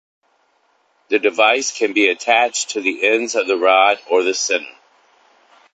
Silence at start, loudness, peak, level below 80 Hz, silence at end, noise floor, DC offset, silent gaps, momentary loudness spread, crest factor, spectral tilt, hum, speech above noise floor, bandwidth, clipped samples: 1.1 s; -16 LUFS; 0 dBFS; -68 dBFS; 1.05 s; -61 dBFS; under 0.1%; none; 6 LU; 18 dB; -0.5 dB/octave; none; 45 dB; 9.2 kHz; under 0.1%